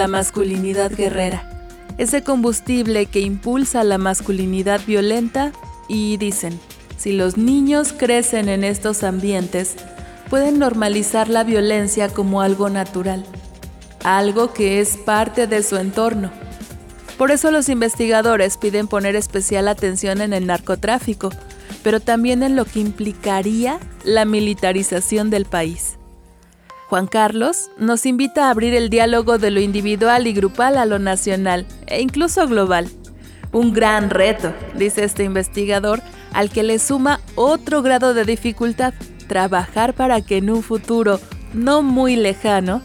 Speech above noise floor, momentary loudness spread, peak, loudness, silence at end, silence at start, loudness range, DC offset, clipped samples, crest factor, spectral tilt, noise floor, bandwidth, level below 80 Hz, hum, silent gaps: 30 dB; 9 LU; -2 dBFS; -17 LUFS; 0 s; 0 s; 3 LU; under 0.1%; under 0.1%; 16 dB; -4 dB/octave; -47 dBFS; 18 kHz; -38 dBFS; none; none